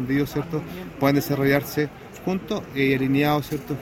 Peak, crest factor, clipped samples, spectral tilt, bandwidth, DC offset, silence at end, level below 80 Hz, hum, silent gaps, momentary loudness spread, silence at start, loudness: -4 dBFS; 18 dB; under 0.1%; -6.5 dB/octave; 17 kHz; under 0.1%; 0 s; -50 dBFS; none; none; 9 LU; 0 s; -24 LUFS